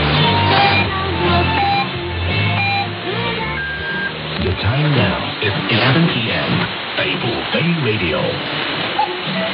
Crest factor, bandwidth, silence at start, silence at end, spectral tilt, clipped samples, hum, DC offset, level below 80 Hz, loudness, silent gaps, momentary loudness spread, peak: 16 dB; 5.4 kHz; 0 s; 0 s; -11 dB/octave; under 0.1%; none; under 0.1%; -38 dBFS; -17 LUFS; none; 7 LU; -2 dBFS